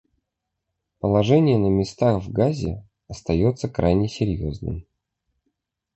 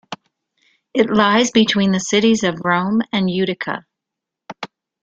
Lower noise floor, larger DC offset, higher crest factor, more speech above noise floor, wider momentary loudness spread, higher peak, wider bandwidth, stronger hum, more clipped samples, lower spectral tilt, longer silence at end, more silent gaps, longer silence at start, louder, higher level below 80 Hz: about the same, -81 dBFS vs -83 dBFS; neither; about the same, 18 dB vs 18 dB; second, 60 dB vs 67 dB; second, 15 LU vs 19 LU; second, -6 dBFS vs -2 dBFS; about the same, 8.4 kHz vs 8 kHz; neither; neither; first, -8 dB/octave vs -4.5 dB/octave; first, 1.15 s vs 0.4 s; neither; first, 1.05 s vs 0.1 s; second, -22 LUFS vs -17 LUFS; first, -40 dBFS vs -56 dBFS